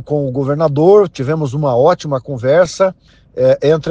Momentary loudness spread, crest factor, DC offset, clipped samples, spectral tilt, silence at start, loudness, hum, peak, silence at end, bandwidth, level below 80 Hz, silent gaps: 8 LU; 12 dB; under 0.1%; under 0.1%; -7 dB/octave; 0 s; -13 LUFS; none; 0 dBFS; 0 s; 9.2 kHz; -48 dBFS; none